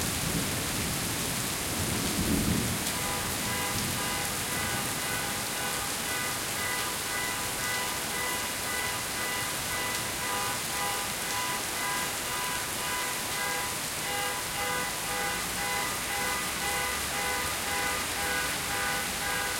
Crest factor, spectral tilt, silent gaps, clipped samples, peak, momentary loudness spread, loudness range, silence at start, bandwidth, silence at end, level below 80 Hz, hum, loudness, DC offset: 20 dB; -2 dB/octave; none; under 0.1%; -12 dBFS; 2 LU; 1 LU; 0 s; 16.5 kHz; 0 s; -50 dBFS; none; -29 LUFS; under 0.1%